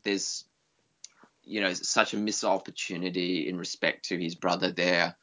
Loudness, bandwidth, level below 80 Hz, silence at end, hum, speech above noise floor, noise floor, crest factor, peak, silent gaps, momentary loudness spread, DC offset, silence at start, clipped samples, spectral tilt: -29 LUFS; 8 kHz; -76 dBFS; 0.1 s; none; 44 dB; -73 dBFS; 26 dB; -4 dBFS; none; 8 LU; under 0.1%; 0.05 s; under 0.1%; -3 dB/octave